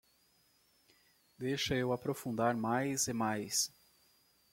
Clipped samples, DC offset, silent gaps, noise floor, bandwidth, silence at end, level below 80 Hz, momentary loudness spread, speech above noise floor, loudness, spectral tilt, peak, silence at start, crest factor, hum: under 0.1%; under 0.1%; none; -71 dBFS; 16.5 kHz; 0.85 s; -66 dBFS; 5 LU; 37 dB; -35 LUFS; -3.5 dB/octave; -16 dBFS; 1.4 s; 20 dB; none